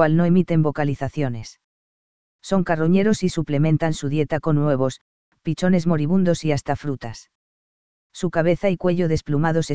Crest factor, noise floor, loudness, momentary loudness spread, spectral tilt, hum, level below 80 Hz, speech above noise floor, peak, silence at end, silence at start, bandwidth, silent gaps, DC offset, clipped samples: 18 dB; under -90 dBFS; -21 LUFS; 13 LU; -7 dB/octave; none; -48 dBFS; over 70 dB; -2 dBFS; 0 s; 0 s; 8 kHz; 1.64-2.39 s, 5.01-5.32 s, 7.35-8.10 s; 2%; under 0.1%